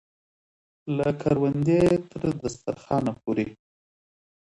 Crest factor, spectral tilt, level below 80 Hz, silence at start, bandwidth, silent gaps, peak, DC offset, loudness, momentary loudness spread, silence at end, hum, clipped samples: 18 dB; -7.5 dB/octave; -54 dBFS; 0.85 s; 11.5 kHz; none; -8 dBFS; under 0.1%; -25 LUFS; 11 LU; 0.85 s; none; under 0.1%